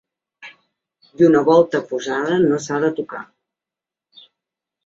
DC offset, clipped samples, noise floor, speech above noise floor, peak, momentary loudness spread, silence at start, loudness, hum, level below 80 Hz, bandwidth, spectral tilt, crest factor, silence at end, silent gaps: under 0.1%; under 0.1%; -88 dBFS; 71 dB; -2 dBFS; 14 LU; 0.4 s; -17 LUFS; none; -64 dBFS; 8 kHz; -6 dB/octave; 18 dB; 1.6 s; none